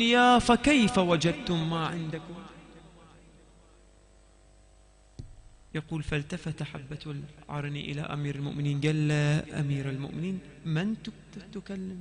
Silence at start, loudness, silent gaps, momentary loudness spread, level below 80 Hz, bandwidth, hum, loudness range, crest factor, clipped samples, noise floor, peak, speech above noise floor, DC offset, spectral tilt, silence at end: 0 s; -29 LUFS; none; 20 LU; -52 dBFS; 10 kHz; none; 14 LU; 22 dB; under 0.1%; -58 dBFS; -8 dBFS; 30 dB; under 0.1%; -5.5 dB/octave; 0 s